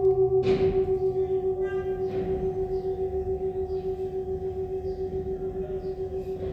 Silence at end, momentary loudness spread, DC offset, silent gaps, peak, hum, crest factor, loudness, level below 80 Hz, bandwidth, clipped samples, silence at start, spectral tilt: 0 s; 9 LU; under 0.1%; none; -14 dBFS; none; 14 dB; -28 LUFS; -44 dBFS; 5.4 kHz; under 0.1%; 0 s; -9 dB/octave